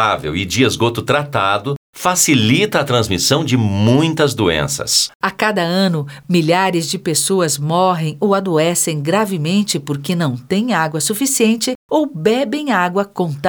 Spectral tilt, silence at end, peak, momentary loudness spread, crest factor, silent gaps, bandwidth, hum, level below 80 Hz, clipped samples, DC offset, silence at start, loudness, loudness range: -4 dB/octave; 0 s; -2 dBFS; 5 LU; 14 dB; 1.77-1.93 s, 5.15-5.20 s, 11.75-11.89 s; over 20 kHz; none; -48 dBFS; under 0.1%; under 0.1%; 0 s; -16 LUFS; 2 LU